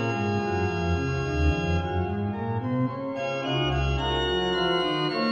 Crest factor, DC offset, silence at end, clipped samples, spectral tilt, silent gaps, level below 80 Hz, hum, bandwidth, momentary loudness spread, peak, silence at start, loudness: 14 dB; under 0.1%; 0 s; under 0.1%; -6.5 dB/octave; none; -38 dBFS; none; 8.6 kHz; 5 LU; -12 dBFS; 0 s; -26 LUFS